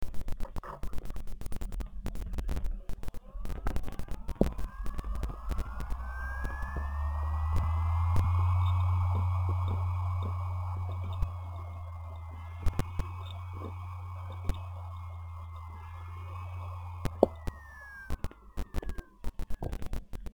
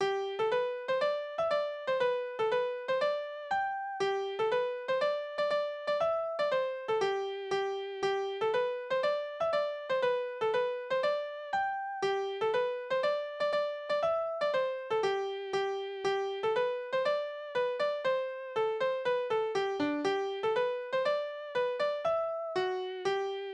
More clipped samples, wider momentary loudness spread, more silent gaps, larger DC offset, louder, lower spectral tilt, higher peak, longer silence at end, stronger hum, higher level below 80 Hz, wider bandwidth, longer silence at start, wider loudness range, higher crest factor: neither; first, 15 LU vs 3 LU; neither; neither; second, -36 LUFS vs -32 LUFS; first, -7.5 dB/octave vs -4 dB/octave; first, -4 dBFS vs -18 dBFS; about the same, 0 s vs 0 s; neither; first, -38 dBFS vs -74 dBFS; first, 19 kHz vs 9.8 kHz; about the same, 0 s vs 0 s; first, 11 LU vs 1 LU; first, 28 dB vs 14 dB